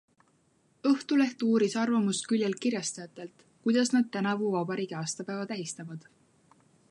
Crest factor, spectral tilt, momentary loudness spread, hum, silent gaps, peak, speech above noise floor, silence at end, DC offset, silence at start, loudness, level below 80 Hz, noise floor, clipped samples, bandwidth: 16 dB; -4.5 dB/octave; 15 LU; none; none; -14 dBFS; 39 dB; 0.9 s; under 0.1%; 0.85 s; -29 LUFS; -80 dBFS; -68 dBFS; under 0.1%; 11.5 kHz